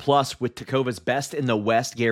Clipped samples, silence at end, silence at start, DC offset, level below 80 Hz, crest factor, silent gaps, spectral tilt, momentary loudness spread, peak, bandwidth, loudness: under 0.1%; 0 s; 0 s; under 0.1%; -60 dBFS; 18 dB; none; -5 dB/octave; 5 LU; -6 dBFS; 16 kHz; -24 LUFS